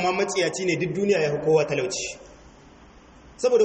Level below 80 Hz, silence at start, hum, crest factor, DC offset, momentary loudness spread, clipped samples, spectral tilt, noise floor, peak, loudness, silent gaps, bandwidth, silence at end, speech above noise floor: -56 dBFS; 0 s; none; 16 dB; under 0.1%; 8 LU; under 0.1%; -4.5 dB/octave; -49 dBFS; -8 dBFS; -24 LUFS; none; 8.8 kHz; 0 s; 26 dB